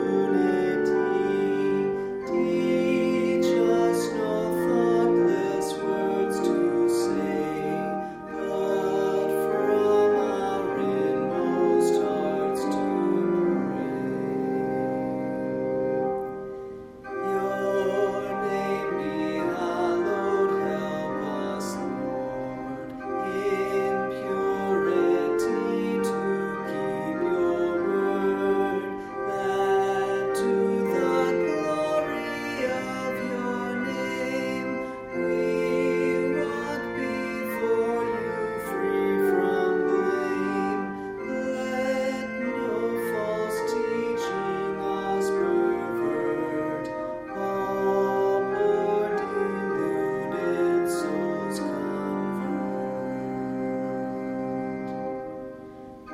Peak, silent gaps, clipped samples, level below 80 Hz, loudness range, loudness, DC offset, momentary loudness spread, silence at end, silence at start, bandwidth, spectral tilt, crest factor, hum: -10 dBFS; none; under 0.1%; -58 dBFS; 5 LU; -26 LUFS; under 0.1%; 8 LU; 0 s; 0 s; 16 kHz; -6 dB/octave; 14 dB; none